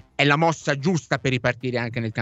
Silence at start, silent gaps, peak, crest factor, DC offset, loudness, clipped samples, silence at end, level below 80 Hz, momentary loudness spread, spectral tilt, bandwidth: 0.2 s; none; -2 dBFS; 20 dB; under 0.1%; -22 LUFS; under 0.1%; 0 s; -56 dBFS; 8 LU; -5.5 dB/octave; 8.2 kHz